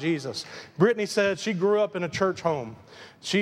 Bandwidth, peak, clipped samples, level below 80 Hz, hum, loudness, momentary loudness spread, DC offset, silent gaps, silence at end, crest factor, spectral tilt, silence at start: 13.5 kHz; -8 dBFS; under 0.1%; -66 dBFS; none; -26 LUFS; 15 LU; under 0.1%; none; 0 s; 18 dB; -5 dB/octave; 0 s